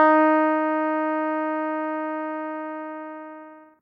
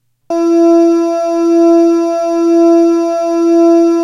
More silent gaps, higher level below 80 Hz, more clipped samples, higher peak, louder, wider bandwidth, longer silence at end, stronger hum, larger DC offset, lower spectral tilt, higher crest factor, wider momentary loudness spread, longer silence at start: neither; second, -82 dBFS vs -62 dBFS; neither; second, -6 dBFS vs 0 dBFS; second, -24 LUFS vs -10 LUFS; second, 4.9 kHz vs 7.4 kHz; first, 0.2 s vs 0 s; neither; neither; first, -7 dB/octave vs -4 dB/octave; first, 18 dB vs 8 dB; first, 18 LU vs 6 LU; second, 0 s vs 0.3 s